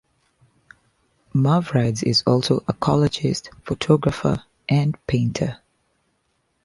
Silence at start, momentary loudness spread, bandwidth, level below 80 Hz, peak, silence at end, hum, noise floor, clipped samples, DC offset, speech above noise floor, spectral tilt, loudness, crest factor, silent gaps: 1.35 s; 9 LU; 11.5 kHz; -48 dBFS; -4 dBFS; 1.1 s; none; -69 dBFS; under 0.1%; under 0.1%; 49 dB; -6.5 dB/octave; -21 LUFS; 18 dB; none